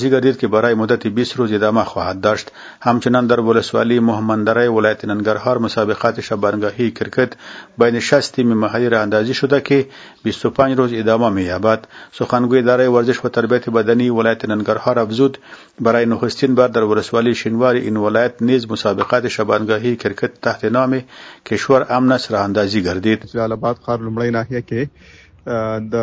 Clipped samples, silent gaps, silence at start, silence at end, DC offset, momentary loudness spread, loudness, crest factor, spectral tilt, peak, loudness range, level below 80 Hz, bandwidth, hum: under 0.1%; none; 0 s; 0 s; under 0.1%; 7 LU; -16 LUFS; 16 dB; -6.5 dB/octave; 0 dBFS; 2 LU; -48 dBFS; 8 kHz; none